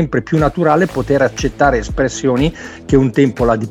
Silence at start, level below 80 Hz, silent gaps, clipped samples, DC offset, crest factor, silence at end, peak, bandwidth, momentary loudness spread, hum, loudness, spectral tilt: 0 s; -30 dBFS; none; under 0.1%; under 0.1%; 14 dB; 0 s; 0 dBFS; 13 kHz; 4 LU; none; -15 LUFS; -6.5 dB/octave